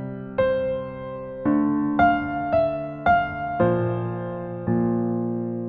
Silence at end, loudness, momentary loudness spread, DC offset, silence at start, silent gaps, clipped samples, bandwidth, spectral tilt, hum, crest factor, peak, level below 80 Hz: 0 s; -24 LUFS; 10 LU; under 0.1%; 0 s; none; under 0.1%; 5 kHz; -7 dB/octave; none; 16 dB; -6 dBFS; -48 dBFS